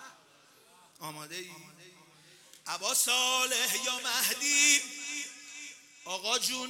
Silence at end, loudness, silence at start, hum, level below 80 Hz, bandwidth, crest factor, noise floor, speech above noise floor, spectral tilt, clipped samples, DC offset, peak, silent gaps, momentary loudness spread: 0 s; -27 LUFS; 0 s; none; -84 dBFS; 16.5 kHz; 24 dB; -61 dBFS; 30 dB; 1 dB/octave; under 0.1%; under 0.1%; -10 dBFS; none; 22 LU